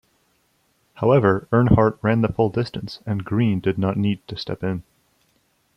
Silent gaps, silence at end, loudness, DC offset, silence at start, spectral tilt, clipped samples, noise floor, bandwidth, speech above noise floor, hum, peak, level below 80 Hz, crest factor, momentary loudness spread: none; 0.95 s; -21 LUFS; under 0.1%; 0.95 s; -9 dB/octave; under 0.1%; -65 dBFS; 6.2 kHz; 45 dB; none; -2 dBFS; -44 dBFS; 18 dB; 12 LU